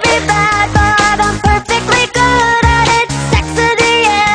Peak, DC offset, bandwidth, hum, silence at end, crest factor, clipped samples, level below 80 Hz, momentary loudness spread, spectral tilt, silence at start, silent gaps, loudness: 0 dBFS; under 0.1%; 13 kHz; none; 0 s; 10 dB; under 0.1%; -22 dBFS; 4 LU; -3.5 dB/octave; 0 s; none; -10 LUFS